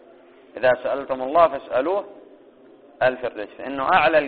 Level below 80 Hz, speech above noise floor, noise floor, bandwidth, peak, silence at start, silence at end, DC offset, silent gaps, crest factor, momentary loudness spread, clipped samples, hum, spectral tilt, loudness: -58 dBFS; 29 dB; -50 dBFS; 4.7 kHz; -2 dBFS; 0.55 s; 0 s; under 0.1%; none; 20 dB; 13 LU; under 0.1%; none; -2 dB/octave; -22 LUFS